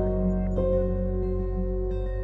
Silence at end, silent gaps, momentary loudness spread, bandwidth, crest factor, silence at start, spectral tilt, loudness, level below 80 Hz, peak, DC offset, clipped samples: 0 s; none; 4 LU; 3.9 kHz; 12 dB; 0 s; -11.5 dB/octave; -28 LUFS; -30 dBFS; -14 dBFS; under 0.1%; under 0.1%